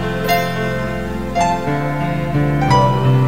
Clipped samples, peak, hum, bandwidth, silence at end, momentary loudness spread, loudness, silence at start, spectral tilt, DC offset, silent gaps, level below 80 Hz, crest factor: under 0.1%; -2 dBFS; none; 16 kHz; 0 s; 8 LU; -17 LUFS; 0 s; -6.5 dB/octave; 2%; none; -34 dBFS; 16 dB